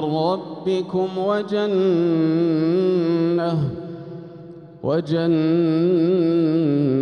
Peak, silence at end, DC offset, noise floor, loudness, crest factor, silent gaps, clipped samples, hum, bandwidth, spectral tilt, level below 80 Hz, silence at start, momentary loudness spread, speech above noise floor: -8 dBFS; 0 s; under 0.1%; -39 dBFS; -20 LUFS; 12 dB; none; under 0.1%; none; 6.4 kHz; -9 dB/octave; -60 dBFS; 0 s; 13 LU; 20 dB